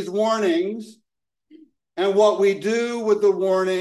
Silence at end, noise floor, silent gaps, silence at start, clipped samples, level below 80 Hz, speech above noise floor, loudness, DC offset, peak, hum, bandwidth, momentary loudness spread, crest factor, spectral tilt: 0 s; -61 dBFS; none; 0 s; under 0.1%; -76 dBFS; 41 dB; -20 LUFS; under 0.1%; -6 dBFS; none; 12 kHz; 9 LU; 16 dB; -5 dB/octave